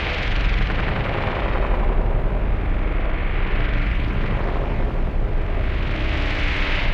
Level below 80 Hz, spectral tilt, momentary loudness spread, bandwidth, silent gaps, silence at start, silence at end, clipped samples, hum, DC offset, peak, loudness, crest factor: -20 dBFS; -7 dB/octave; 3 LU; 6 kHz; none; 0 s; 0 s; under 0.1%; none; under 0.1%; -8 dBFS; -24 LUFS; 12 dB